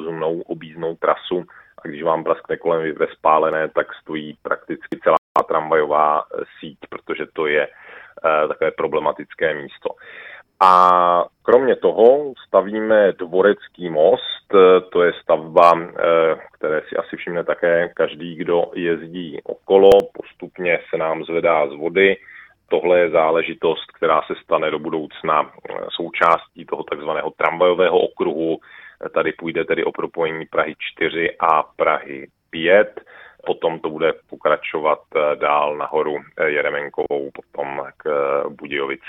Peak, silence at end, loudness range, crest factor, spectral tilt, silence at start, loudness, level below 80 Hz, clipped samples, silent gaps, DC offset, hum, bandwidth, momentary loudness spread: 0 dBFS; 0 s; 6 LU; 18 dB; -6.5 dB/octave; 0 s; -19 LUFS; -58 dBFS; under 0.1%; 5.18-5.35 s; under 0.1%; none; 7 kHz; 15 LU